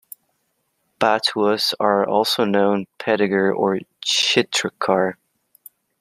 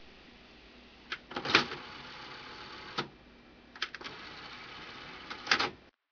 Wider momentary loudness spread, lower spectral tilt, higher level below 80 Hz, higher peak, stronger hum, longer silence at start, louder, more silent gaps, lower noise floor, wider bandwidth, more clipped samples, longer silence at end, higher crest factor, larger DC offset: second, 5 LU vs 27 LU; about the same, -3.5 dB/octave vs -2.5 dB/octave; about the same, -68 dBFS vs -66 dBFS; first, -2 dBFS vs -6 dBFS; neither; first, 1 s vs 0 s; first, -19 LUFS vs -35 LUFS; neither; first, -70 dBFS vs -57 dBFS; first, 15 kHz vs 5.4 kHz; neither; first, 0.9 s vs 0.2 s; second, 20 dB vs 32 dB; neither